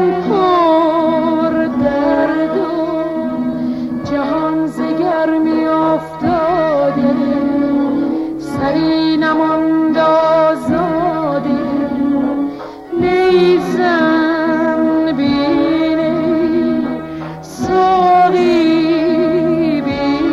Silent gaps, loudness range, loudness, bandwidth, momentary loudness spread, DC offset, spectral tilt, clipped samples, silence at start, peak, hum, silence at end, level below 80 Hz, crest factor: none; 3 LU; -14 LUFS; 11.5 kHz; 7 LU; under 0.1%; -7 dB/octave; under 0.1%; 0 s; -2 dBFS; none; 0 s; -44 dBFS; 12 dB